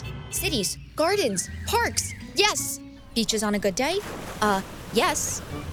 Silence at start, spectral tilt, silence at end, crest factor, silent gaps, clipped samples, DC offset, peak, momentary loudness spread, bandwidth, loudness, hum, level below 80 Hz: 0 s; -3 dB/octave; 0 s; 22 dB; none; under 0.1%; under 0.1%; -4 dBFS; 8 LU; over 20 kHz; -25 LUFS; none; -44 dBFS